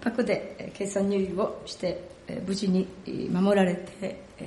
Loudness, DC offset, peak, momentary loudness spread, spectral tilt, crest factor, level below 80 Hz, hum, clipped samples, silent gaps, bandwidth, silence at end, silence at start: -28 LUFS; under 0.1%; -12 dBFS; 13 LU; -6 dB/octave; 16 dB; -58 dBFS; none; under 0.1%; none; 11.5 kHz; 0 s; 0 s